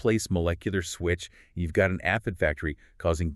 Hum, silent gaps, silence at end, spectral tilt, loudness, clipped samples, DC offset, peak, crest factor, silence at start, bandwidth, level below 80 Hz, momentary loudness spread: none; none; 0 s; -5.5 dB/octave; -28 LUFS; under 0.1%; under 0.1%; -10 dBFS; 18 dB; 0 s; 13 kHz; -40 dBFS; 8 LU